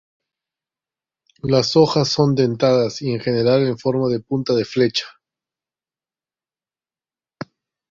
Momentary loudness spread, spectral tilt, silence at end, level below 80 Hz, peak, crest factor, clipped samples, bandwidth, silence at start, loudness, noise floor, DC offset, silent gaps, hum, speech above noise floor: 19 LU; -6 dB/octave; 2.8 s; -56 dBFS; -2 dBFS; 18 dB; under 0.1%; 7.6 kHz; 1.45 s; -18 LUFS; under -90 dBFS; under 0.1%; none; none; over 72 dB